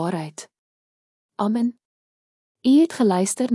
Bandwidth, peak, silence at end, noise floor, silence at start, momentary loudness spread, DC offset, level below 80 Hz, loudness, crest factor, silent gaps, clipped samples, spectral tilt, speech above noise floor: 12 kHz; -8 dBFS; 0 s; under -90 dBFS; 0 s; 19 LU; under 0.1%; -78 dBFS; -21 LUFS; 16 dB; 0.58-1.29 s, 1.85-2.55 s; under 0.1%; -5.5 dB/octave; over 70 dB